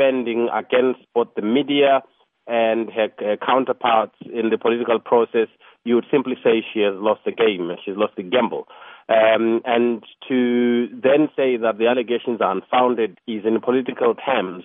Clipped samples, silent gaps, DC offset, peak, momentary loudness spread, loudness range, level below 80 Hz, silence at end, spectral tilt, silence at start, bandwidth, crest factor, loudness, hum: under 0.1%; none; under 0.1%; -4 dBFS; 7 LU; 2 LU; -76 dBFS; 0.05 s; -3 dB/octave; 0 s; 3.9 kHz; 16 dB; -20 LUFS; none